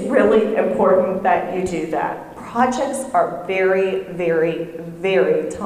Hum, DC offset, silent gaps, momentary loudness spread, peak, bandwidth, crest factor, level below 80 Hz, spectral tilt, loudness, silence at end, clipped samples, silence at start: none; under 0.1%; none; 9 LU; -2 dBFS; 14.5 kHz; 16 dB; -52 dBFS; -5.5 dB/octave; -19 LUFS; 0 s; under 0.1%; 0 s